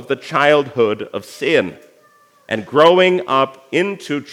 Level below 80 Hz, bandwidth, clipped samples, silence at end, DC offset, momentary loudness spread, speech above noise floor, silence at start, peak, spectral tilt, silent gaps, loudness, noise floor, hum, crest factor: -70 dBFS; 15 kHz; under 0.1%; 0 s; under 0.1%; 13 LU; 36 dB; 0 s; 0 dBFS; -5 dB/octave; none; -16 LUFS; -52 dBFS; none; 16 dB